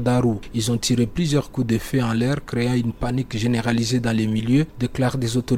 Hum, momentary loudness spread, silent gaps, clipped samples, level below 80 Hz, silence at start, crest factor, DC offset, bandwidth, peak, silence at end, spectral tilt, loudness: none; 4 LU; none; under 0.1%; -40 dBFS; 0 s; 16 dB; under 0.1%; 16 kHz; -6 dBFS; 0 s; -6 dB/octave; -22 LUFS